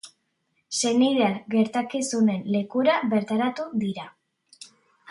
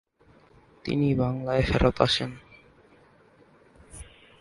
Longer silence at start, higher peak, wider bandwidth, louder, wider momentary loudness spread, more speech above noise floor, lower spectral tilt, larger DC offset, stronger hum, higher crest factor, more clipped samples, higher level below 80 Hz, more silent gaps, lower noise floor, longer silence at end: second, 0.05 s vs 0.85 s; second, -10 dBFS vs -4 dBFS; about the same, 11.5 kHz vs 11.5 kHz; about the same, -24 LUFS vs -25 LUFS; second, 8 LU vs 24 LU; first, 50 dB vs 34 dB; second, -4.5 dB/octave vs -6 dB/octave; neither; neither; second, 16 dB vs 24 dB; neither; second, -72 dBFS vs -42 dBFS; neither; first, -73 dBFS vs -58 dBFS; about the same, 0.45 s vs 0.35 s